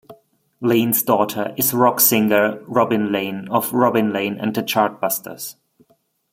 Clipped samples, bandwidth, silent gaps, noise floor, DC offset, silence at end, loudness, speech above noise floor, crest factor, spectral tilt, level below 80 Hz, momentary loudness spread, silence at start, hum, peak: under 0.1%; 16.5 kHz; none; -62 dBFS; under 0.1%; 0.8 s; -18 LUFS; 43 dB; 20 dB; -4 dB/octave; -64 dBFS; 9 LU; 0.1 s; none; 0 dBFS